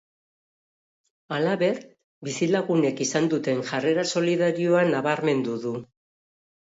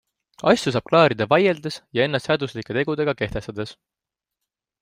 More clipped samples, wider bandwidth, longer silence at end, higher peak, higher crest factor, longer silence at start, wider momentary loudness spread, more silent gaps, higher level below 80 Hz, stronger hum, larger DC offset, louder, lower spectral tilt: neither; second, 8 kHz vs 15.5 kHz; second, 0.85 s vs 1.1 s; second, -10 dBFS vs -2 dBFS; about the same, 16 dB vs 20 dB; first, 1.3 s vs 0.45 s; about the same, 11 LU vs 12 LU; first, 2.04-2.21 s vs none; second, -74 dBFS vs -52 dBFS; neither; neither; second, -24 LUFS vs -21 LUFS; about the same, -5 dB/octave vs -5.5 dB/octave